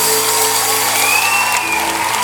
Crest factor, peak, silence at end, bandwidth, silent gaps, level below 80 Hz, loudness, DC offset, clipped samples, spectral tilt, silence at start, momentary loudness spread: 14 dB; 0 dBFS; 0 s; 19.5 kHz; none; -52 dBFS; -12 LUFS; under 0.1%; under 0.1%; 0 dB/octave; 0 s; 4 LU